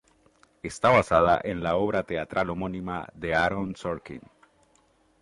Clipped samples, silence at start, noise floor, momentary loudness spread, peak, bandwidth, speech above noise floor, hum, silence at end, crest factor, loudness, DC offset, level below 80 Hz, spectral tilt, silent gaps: under 0.1%; 0.65 s; -64 dBFS; 16 LU; -6 dBFS; 11.5 kHz; 38 dB; none; 1 s; 20 dB; -26 LUFS; under 0.1%; -50 dBFS; -6 dB/octave; none